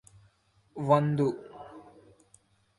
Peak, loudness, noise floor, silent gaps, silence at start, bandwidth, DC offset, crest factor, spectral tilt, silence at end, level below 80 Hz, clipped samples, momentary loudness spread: -10 dBFS; -27 LUFS; -66 dBFS; none; 0.75 s; 11.5 kHz; under 0.1%; 22 dB; -8.5 dB/octave; 0.95 s; -68 dBFS; under 0.1%; 24 LU